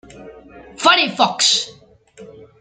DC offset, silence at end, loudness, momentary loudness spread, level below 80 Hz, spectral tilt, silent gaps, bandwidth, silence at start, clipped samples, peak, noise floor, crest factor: under 0.1%; 0.15 s; -15 LUFS; 5 LU; -58 dBFS; -1 dB/octave; none; 13 kHz; 0.15 s; under 0.1%; 0 dBFS; -43 dBFS; 20 dB